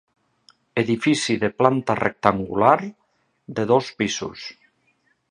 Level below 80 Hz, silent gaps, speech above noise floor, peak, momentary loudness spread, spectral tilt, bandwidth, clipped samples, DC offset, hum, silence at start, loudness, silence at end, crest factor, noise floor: -56 dBFS; none; 45 dB; 0 dBFS; 14 LU; -5 dB/octave; 11.5 kHz; under 0.1%; under 0.1%; none; 0.75 s; -21 LUFS; 0.8 s; 22 dB; -66 dBFS